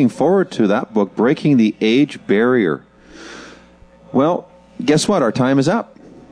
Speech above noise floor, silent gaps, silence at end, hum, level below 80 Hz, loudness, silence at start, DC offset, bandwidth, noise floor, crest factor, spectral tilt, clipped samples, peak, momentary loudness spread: 30 dB; none; 0.5 s; none; -56 dBFS; -16 LUFS; 0 s; under 0.1%; 11 kHz; -45 dBFS; 14 dB; -6 dB/octave; under 0.1%; -2 dBFS; 13 LU